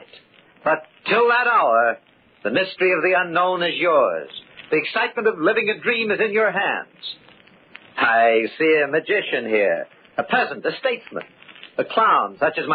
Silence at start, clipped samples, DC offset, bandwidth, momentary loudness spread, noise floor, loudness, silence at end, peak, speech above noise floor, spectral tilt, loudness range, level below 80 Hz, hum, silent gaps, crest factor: 0.65 s; under 0.1%; under 0.1%; 4.9 kHz; 14 LU; -50 dBFS; -20 LUFS; 0 s; -6 dBFS; 31 dB; -8.5 dB/octave; 3 LU; -72 dBFS; none; none; 16 dB